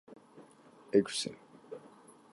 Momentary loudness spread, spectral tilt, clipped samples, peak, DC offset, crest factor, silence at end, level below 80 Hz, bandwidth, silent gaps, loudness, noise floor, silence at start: 26 LU; -4 dB/octave; under 0.1%; -14 dBFS; under 0.1%; 24 dB; 0.45 s; -78 dBFS; 11.5 kHz; none; -32 LUFS; -59 dBFS; 0.1 s